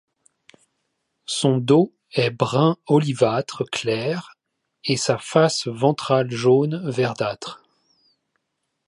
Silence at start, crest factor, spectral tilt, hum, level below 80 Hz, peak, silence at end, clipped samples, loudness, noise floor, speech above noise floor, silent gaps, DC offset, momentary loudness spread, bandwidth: 1.3 s; 18 dB; -5.5 dB/octave; none; -66 dBFS; -4 dBFS; 1.3 s; under 0.1%; -21 LUFS; -77 dBFS; 57 dB; none; under 0.1%; 9 LU; 11.5 kHz